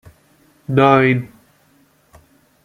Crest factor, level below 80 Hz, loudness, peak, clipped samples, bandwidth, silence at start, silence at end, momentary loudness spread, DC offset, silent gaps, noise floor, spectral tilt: 18 dB; -56 dBFS; -15 LUFS; 0 dBFS; under 0.1%; 10 kHz; 0.7 s; 1.4 s; 25 LU; under 0.1%; none; -56 dBFS; -8 dB/octave